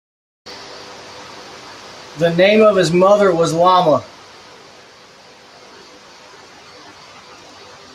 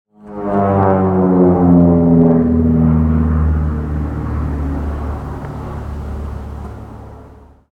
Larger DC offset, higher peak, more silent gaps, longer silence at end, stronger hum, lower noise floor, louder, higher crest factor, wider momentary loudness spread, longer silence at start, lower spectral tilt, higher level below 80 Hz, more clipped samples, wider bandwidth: neither; about the same, 0 dBFS vs 0 dBFS; neither; first, 3.9 s vs 0.45 s; neither; about the same, -43 dBFS vs -40 dBFS; about the same, -13 LUFS vs -14 LUFS; about the same, 18 dB vs 14 dB; first, 23 LU vs 18 LU; first, 0.45 s vs 0.25 s; second, -5.5 dB/octave vs -11.5 dB/octave; second, -60 dBFS vs -24 dBFS; neither; first, 13 kHz vs 3.4 kHz